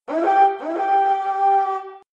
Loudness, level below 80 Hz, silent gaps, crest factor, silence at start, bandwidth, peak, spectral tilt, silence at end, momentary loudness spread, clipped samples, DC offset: -19 LUFS; -76 dBFS; none; 14 dB; 0.1 s; 7.2 kHz; -6 dBFS; -4 dB/octave; 0.15 s; 8 LU; under 0.1%; under 0.1%